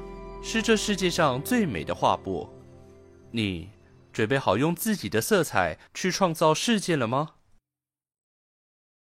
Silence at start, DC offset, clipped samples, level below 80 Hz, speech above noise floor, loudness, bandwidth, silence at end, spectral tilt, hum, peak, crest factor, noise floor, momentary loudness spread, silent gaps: 0 s; under 0.1%; under 0.1%; -52 dBFS; over 65 dB; -25 LUFS; 16 kHz; 1.75 s; -4.5 dB/octave; none; -6 dBFS; 20 dB; under -90 dBFS; 12 LU; none